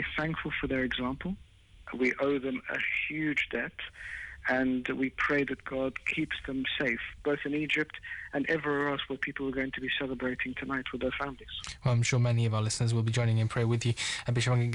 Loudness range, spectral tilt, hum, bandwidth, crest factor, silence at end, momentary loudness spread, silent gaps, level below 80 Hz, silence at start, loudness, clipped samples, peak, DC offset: 3 LU; -5.5 dB/octave; none; 11 kHz; 14 dB; 0 s; 8 LU; none; -54 dBFS; 0 s; -31 LUFS; under 0.1%; -18 dBFS; under 0.1%